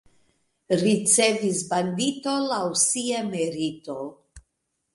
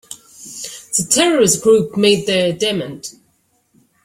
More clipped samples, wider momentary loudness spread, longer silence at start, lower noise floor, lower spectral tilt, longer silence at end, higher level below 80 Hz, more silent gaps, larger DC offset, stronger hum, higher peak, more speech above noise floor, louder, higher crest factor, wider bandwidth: neither; second, 13 LU vs 21 LU; first, 0.7 s vs 0.1 s; first, -78 dBFS vs -61 dBFS; about the same, -3 dB/octave vs -3 dB/octave; second, 0.55 s vs 0.95 s; second, -62 dBFS vs -54 dBFS; neither; neither; neither; second, -6 dBFS vs 0 dBFS; first, 54 dB vs 46 dB; second, -23 LUFS vs -14 LUFS; about the same, 18 dB vs 16 dB; second, 11.5 kHz vs 16.5 kHz